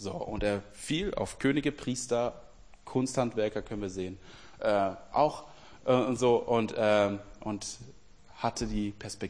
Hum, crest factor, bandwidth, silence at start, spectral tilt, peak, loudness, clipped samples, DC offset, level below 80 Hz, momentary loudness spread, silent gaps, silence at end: none; 20 dB; 10.5 kHz; 0 s; -5 dB/octave; -10 dBFS; -31 LUFS; under 0.1%; 0.2%; -50 dBFS; 11 LU; none; 0 s